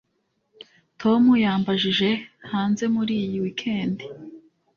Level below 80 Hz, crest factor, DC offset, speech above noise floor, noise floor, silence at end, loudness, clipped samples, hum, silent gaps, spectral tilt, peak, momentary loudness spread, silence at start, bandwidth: -62 dBFS; 16 dB; under 0.1%; 50 dB; -72 dBFS; 0.4 s; -22 LUFS; under 0.1%; none; none; -6 dB/octave; -8 dBFS; 12 LU; 1 s; 7.2 kHz